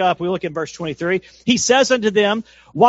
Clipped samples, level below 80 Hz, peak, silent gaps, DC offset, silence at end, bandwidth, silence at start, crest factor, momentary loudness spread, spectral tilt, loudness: under 0.1%; -56 dBFS; 0 dBFS; none; under 0.1%; 0 s; 8 kHz; 0 s; 18 dB; 11 LU; -3 dB/octave; -18 LUFS